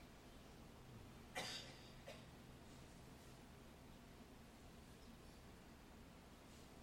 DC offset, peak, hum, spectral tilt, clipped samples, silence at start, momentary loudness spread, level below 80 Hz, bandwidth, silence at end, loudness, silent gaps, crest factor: under 0.1%; -32 dBFS; none; -3.5 dB/octave; under 0.1%; 0 s; 12 LU; -68 dBFS; 16.5 kHz; 0 s; -58 LUFS; none; 26 dB